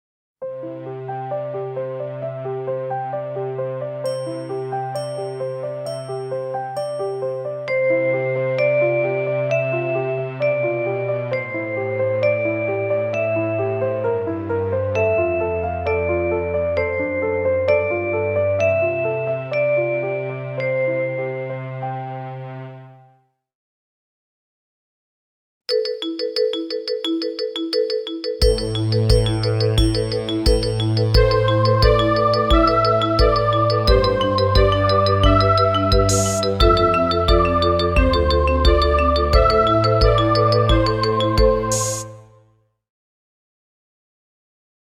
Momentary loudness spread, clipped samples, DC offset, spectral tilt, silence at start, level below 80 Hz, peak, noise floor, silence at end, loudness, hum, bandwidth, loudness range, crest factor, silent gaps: 11 LU; under 0.1%; under 0.1%; -5.5 dB/octave; 0.4 s; -28 dBFS; 0 dBFS; -59 dBFS; 2.65 s; -19 LUFS; none; 14.5 kHz; 10 LU; 18 dB; 23.55-25.61 s